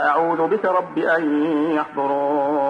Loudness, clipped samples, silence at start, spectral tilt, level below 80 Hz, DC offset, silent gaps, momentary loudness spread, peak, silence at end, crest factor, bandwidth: -20 LUFS; under 0.1%; 0 s; -7.5 dB/octave; -68 dBFS; under 0.1%; none; 3 LU; -6 dBFS; 0 s; 12 dB; 6 kHz